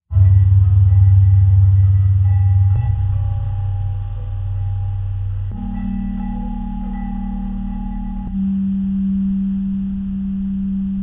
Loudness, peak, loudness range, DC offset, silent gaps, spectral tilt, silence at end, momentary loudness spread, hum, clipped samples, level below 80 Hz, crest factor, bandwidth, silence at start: -18 LUFS; -4 dBFS; 11 LU; under 0.1%; none; -12 dB/octave; 0 s; 13 LU; none; under 0.1%; -26 dBFS; 12 dB; 2.1 kHz; 0.1 s